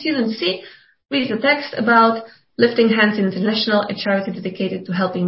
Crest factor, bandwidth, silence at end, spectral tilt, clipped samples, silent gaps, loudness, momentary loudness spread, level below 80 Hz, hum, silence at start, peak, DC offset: 18 dB; 5.8 kHz; 0 s; -9.5 dB/octave; under 0.1%; none; -18 LUFS; 10 LU; -62 dBFS; none; 0 s; -2 dBFS; under 0.1%